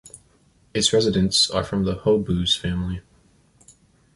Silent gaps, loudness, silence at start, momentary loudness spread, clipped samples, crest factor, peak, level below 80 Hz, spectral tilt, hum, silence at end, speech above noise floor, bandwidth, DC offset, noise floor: none; -21 LUFS; 0.05 s; 11 LU; under 0.1%; 18 dB; -6 dBFS; -42 dBFS; -4.5 dB/octave; none; 1.15 s; 38 dB; 11.5 kHz; under 0.1%; -59 dBFS